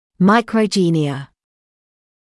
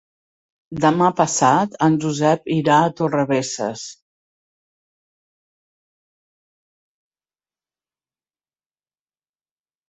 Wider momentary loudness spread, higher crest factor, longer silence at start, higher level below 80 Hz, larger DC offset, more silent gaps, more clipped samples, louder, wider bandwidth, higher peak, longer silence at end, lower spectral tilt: about the same, 9 LU vs 10 LU; second, 14 dB vs 20 dB; second, 0.2 s vs 0.7 s; about the same, -60 dBFS vs -62 dBFS; neither; neither; neither; about the same, -16 LUFS vs -18 LUFS; first, 12 kHz vs 8.4 kHz; about the same, -4 dBFS vs -2 dBFS; second, 0.95 s vs 5.95 s; about the same, -6 dB/octave vs -5 dB/octave